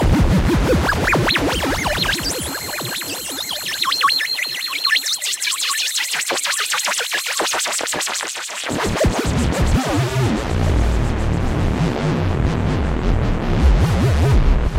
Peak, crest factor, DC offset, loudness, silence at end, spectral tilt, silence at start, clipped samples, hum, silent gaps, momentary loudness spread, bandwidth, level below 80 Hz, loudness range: -2 dBFS; 16 dB; under 0.1%; -18 LUFS; 0 s; -4 dB/octave; 0 s; under 0.1%; none; none; 6 LU; 16 kHz; -24 dBFS; 2 LU